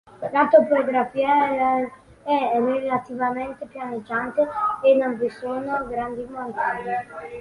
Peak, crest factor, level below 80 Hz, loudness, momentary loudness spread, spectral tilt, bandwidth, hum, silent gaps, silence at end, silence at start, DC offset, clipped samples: -4 dBFS; 18 dB; -58 dBFS; -22 LUFS; 14 LU; -6.5 dB/octave; 11 kHz; none; none; 0 s; 0.15 s; under 0.1%; under 0.1%